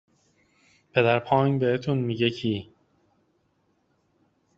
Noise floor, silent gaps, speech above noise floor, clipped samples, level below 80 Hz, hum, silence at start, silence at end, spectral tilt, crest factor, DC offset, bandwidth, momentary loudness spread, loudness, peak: -69 dBFS; none; 46 dB; under 0.1%; -64 dBFS; none; 0.95 s; 1.95 s; -5 dB/octave; 22 dB; under 0.1%; 7.6 kHz; 8 LU; -24 LUFS; -6 dBFS